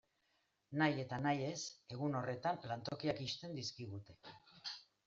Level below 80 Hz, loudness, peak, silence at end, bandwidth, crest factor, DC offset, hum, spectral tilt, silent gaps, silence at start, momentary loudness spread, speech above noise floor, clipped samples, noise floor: -76 dBFS; -42 LUFS; -22 dBFS; 0.25 s; 7.8 kHz; 20 dB; under 0.1%; none; -4.5 dB/octave; none; 0.7 s; 14 LU; 40 dB; under 0.1%; -81 dBFS